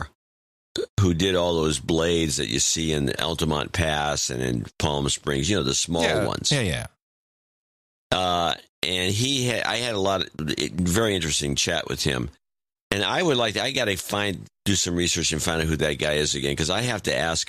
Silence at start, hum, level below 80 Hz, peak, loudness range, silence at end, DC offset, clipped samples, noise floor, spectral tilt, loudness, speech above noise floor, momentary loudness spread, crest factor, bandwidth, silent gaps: 0 s; none; -42 dBFS; -8 dBFS; 2 LU; 0.05 s; under 0.1%; under 0.1%; under -90 dBFS; -3.5 dB/octave; -23 LUFS; over 66 dB; 6 LU; 18 dB; 15.5 kHz; 0.15-0.75 s, 0.89-0.97 s, 7.02-8.10 s, 8.69-8.82 s, 12.81-12.90 s